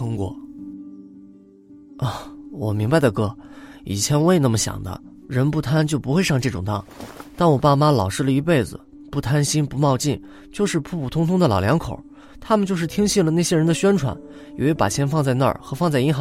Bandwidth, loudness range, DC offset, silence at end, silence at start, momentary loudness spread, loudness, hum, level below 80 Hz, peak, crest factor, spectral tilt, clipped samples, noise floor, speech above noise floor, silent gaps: 16 kHz; 3 LU; under 0.1%; 0 s; 0 s; 19 LU; -20 LUFS; none; -46 dBFS; -2 dBFS; 18 dB; -5.5 dB/octave; under 0.1%; -46 dBFS; 27 dB; none